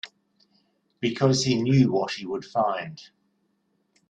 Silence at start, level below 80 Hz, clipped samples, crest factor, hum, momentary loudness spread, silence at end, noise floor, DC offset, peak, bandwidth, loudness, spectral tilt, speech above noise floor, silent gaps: 0.05 s; -62 dBFS; under 0.1%; 20 dB; none; 12 LU; 1.05 s; -71 dBFS; under 0.1%; -6 dBFS; 9.2 kHz; -24 LUFS; -5.5 dB/octave; 48 dB; none